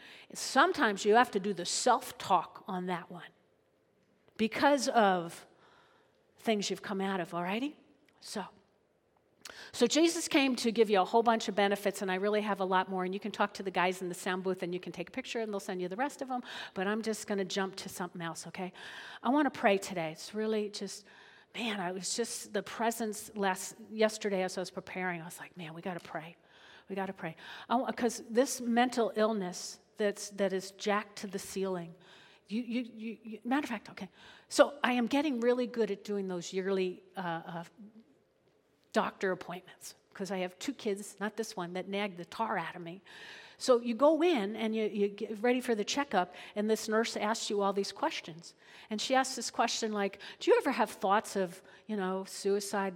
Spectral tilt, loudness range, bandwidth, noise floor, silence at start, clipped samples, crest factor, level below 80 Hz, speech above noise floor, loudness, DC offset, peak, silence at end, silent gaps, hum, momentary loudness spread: -4 dB/octave; 7 LU; 17.5 kHz; -72 dBFS; 0 s; under 0.1%; 26 dB; -78 dBFS; 39 dB; -33 LUFS; under 0.1%; -8 dBFS; 0 s; none; none; 15 LU